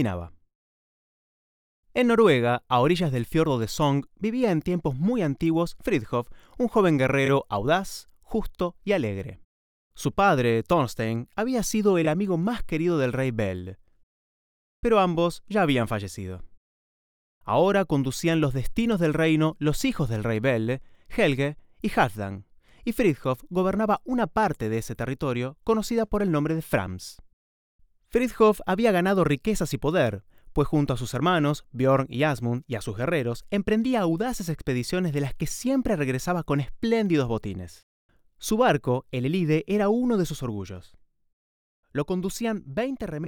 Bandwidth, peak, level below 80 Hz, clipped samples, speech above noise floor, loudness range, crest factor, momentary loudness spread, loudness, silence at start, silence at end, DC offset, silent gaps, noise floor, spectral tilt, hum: 20 kHz; -6 dBFS; -46 dBFS; under 0.1%; over 66 dB; 3 LU; 18 dB; 10 LU; -25 LUFS; 0 s; 0 s; under 0.1%; 0.55-1.83 s, 9.44-9.91 s, 14.03-14.83 s, 16.57-17.41 s, 27.33-27.79 s, 37.83-38.09 s, 41.33-41.83 s; under -90 dBFS; -6 dB/octave; none